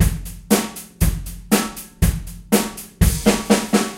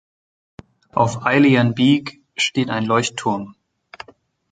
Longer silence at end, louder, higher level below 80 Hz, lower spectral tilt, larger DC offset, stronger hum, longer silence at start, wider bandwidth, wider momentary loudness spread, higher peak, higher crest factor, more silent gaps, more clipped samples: second, 0 s vs 1 s; about the same, -20 LUFS vs -18 LUFS; first, -26 dBFS vs -58 dBFS; about the same, -4.5 dB/octave vs -5 dB/octave; neither; neither; second, 0 s vs 0.95 s; first, 16.5 kHz vs 9.4 kHz; second, 12 LU vs 23 LU; about the same, 0 dBFS vs -2 dBFS; about the same, 18 dB vs 18 dB; neither; neither